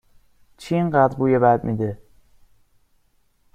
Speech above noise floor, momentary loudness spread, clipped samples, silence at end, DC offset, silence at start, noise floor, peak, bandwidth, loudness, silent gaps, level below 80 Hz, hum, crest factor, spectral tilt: 44 dB; 16 LU; under 0.1%; 1.6 s; under 0.1%; 0.6 s; -62 dBFS; -4 dBFS; 13.5 kHz; -20 LUFS; none; -54 dBFS; none; 20 dB; -8.5 dB/octave